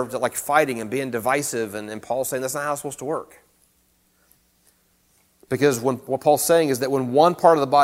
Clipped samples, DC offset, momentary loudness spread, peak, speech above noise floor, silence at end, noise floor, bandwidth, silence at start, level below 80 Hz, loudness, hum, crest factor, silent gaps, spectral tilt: under 0.1%; under 0.1%; 12 LU; -2 dBFS; 42 dB; 0 s; -63 dBFS; 16.5 kHz; 0 s; -64 dBFS; -21 LUFS; none; 20 dB; none; -4.5 dB/octave